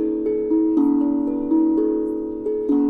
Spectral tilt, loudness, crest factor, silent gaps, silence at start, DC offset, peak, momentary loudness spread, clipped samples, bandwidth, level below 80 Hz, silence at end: -10.5 dB/octave; -20 LUFS; 12 dB; none; 0 s; under 0.1%; -8 dBFS; 7 LU; under 0.1%; 2.4 kHz; -50 dBFS; 0 s